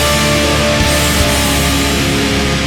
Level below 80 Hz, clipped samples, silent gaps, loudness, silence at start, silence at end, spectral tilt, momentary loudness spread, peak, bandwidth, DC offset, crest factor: -22 dBFS; under 0.1%; none; -12 LUFS; 0 s; 0 s; -3.5 dB/octave; 2 LU; 0 dBFS; 17.5 kHz; under 0.1%; 12 dB